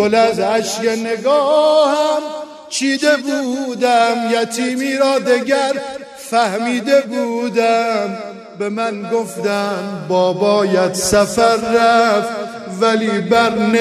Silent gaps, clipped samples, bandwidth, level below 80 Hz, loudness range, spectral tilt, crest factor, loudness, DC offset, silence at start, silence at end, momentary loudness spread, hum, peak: none; under 0.1%; 13.5 kHz; -50 dBFS; 3 LU; -4 dB/octave; 14 dB; -16 LUFS; under 0.1%; 0 s; 0 s; 11 LU; none; 0 dBFS